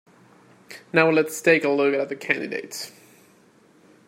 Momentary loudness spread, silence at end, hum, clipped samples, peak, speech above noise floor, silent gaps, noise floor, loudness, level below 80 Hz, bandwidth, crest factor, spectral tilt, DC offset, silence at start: 18 LU; 1.2 s; none; under 0.1%; -2 dBFS; 34 dB; none; -56 dBFS; -21 LUFS; -74 dBFS; 16 kHz; 24 dB; -4.5 dB/octave; under 0.1%; 0.7 s